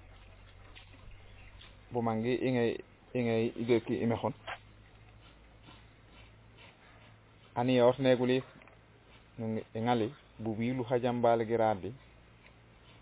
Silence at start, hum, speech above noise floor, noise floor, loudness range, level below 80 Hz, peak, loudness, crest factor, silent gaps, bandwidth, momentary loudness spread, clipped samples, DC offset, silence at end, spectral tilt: 0.1 s; none; 28 dB; -59 dBFS; 7 LU; -62 dBFS; -14 dBFS; -32 LUFS; 20 dB; none; 4 kHz; 26 LU; under 0.1%; under 0.1%; 1.05 s; -6 dB/octave